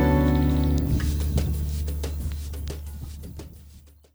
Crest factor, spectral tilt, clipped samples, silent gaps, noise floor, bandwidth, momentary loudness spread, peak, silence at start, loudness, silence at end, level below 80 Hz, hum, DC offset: 16 dB; -7 dB/octave; under 0.1%; none; -49 dBFS; over 20 kHz; 18 LU; -10 dBFS; 0 s; -26 LUFS; 0.35 s; -28 dBFS; none; under 0.1%